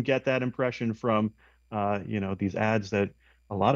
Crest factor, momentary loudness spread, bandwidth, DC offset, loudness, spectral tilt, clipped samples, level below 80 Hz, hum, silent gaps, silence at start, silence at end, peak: 18 dB; 7 LU; 7.4 kHz; under 0.1%; -29 LUFS; -7 dB/octave; under 0.1%; -62 dBFS; none; none; 0 s; 0 s; -10 dBFS